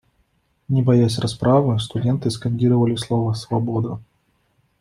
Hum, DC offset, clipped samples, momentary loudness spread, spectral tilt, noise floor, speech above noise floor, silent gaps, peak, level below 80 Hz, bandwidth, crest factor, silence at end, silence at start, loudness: none; under 0.1%; under 0.1%; 7 LU; -7.5 dB/octave; -65 dBFS; 46 dB; none; -4 dBFS; -52 dBFS; 12 kHz; 16 dB; 0.8 s; 0.7 s; -20 LUFS